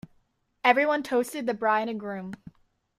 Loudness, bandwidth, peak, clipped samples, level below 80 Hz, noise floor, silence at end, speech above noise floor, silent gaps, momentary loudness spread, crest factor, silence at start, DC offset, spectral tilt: -26 LUFS; 15.5 kHz; -6 dBFS; under 0.1%; -68 dBFS; -69 dBFS; 0.65 s; 43 dB; none; 15 LU; 22 dB; 0.65 s; under 0.1%; -4.5 dB/octave